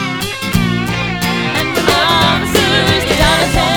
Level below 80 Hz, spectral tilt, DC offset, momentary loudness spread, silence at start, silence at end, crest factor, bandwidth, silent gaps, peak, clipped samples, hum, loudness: -28 dBFS; -4 dB/octave; 0.5%; 6 LU; 0 s; 0 s; 14 dB; 19 kHz; none; 0 dBFS; under 0.1%; none; -12 LUFS